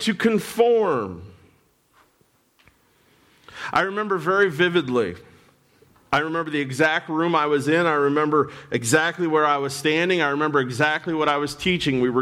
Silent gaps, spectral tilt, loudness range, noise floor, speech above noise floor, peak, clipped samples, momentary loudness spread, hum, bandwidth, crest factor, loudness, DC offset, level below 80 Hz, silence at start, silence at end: none; -4.5 dB/octave; 6 LU; -63 dBFS; 42 dB; -6 dBFS; under 0.1%; 6 LU; none; 16.5 kHz; 16 dB; -21 LUFS; under 0.1%; -58 dBFS; 0 s; 0 s